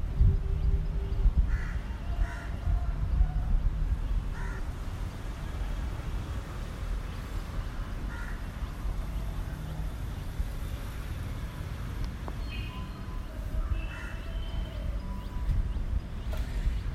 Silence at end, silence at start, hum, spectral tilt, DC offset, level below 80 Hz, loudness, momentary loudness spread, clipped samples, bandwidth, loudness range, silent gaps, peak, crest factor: 0 s; 0 s; none; -6.5 dB/octave; under 0.1%; -32 dBFS; -35 LUFS; 8 LU; under 0.1%; 14 kHz; 6 LU; none; -12 dBFS; 18 dB